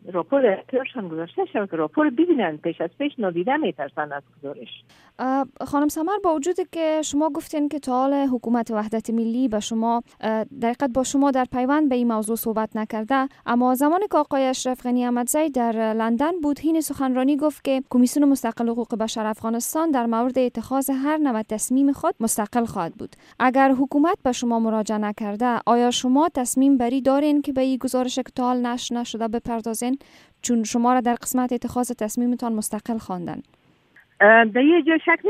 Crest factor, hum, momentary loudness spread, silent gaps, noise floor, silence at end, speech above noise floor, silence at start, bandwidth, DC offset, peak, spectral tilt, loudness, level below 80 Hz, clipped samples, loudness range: 20 dB; none; 8 LU; none; -56 dBFS; 0 s; 35 dB; 0.05 s; 15.5 kHz; under 0.1%; -2 dBFS; -4 dB/octave; -22 LUFS; -58 dBFS; under 0.1%; 4 LU